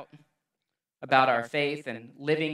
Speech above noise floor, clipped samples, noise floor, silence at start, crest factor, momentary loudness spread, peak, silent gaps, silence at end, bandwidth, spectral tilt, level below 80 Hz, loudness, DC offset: 60 dB; under 0.1%; -86 dBFS; 0 s; 24 dB; 16 LU; -6 dBFS; none; 0 s; 12.5 kHz; -5.5 dB/octave; -80 dBFS; -26 LUFS; under 0.1%